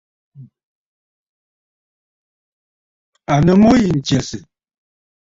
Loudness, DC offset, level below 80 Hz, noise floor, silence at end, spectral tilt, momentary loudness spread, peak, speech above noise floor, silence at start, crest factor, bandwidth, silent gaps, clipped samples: -14 LUFS; under 0.1%; -42 dBFS; under -90 dBFS; 0.85 s; -6.5 dB/octave; 21 LU; -2 dBFS; over 77 dB; 0.4 s; 18 dB; 7.8 kHz; 0.63-3.13 s; under 0.1%